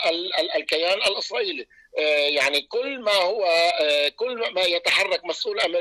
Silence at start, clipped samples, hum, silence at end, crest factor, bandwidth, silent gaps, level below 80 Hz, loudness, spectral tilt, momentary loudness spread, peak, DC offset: 0 s; under 0.1%; none; 0 s; 12 dB; 14.5 kHz; none; -66 dBFS; -22 LUFS; -0.5 dB/octave; 7 LU; -10 dBFS; under 0.1%